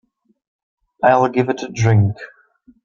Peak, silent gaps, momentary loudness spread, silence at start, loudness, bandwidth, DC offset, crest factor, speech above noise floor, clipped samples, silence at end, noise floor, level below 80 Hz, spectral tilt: 0 dBFS; none; 13 LU; 1 s; -17 LUFS; 7.2 kHz; under 0.1%; 18 dB; 37 dB; under 0.1%; 0.6 s; -53 dBFS; -54 dBFS; -7 dB/octave